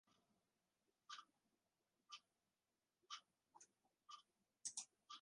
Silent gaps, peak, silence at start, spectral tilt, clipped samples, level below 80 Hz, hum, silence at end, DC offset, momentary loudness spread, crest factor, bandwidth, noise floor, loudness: none; -34 dBFS; 0.05 s; 2.5 dB/octave; under 0.1%; under -90 dBFS; none; 0 s; under 0.1%; 12 LU; 30 dB; 11 kHz; under -90 dBFS; -57 LUFS